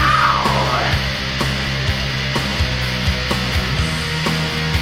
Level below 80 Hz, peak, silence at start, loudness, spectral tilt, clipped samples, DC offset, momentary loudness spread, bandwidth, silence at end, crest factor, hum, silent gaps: -28 dBFS; -2 dBFS; 0 s; -18 LUFS; -4.5 dB/octave; under 0.1%; under 0.1%; 4 LU; 16 kHz; 0 s; 16 dB; none; none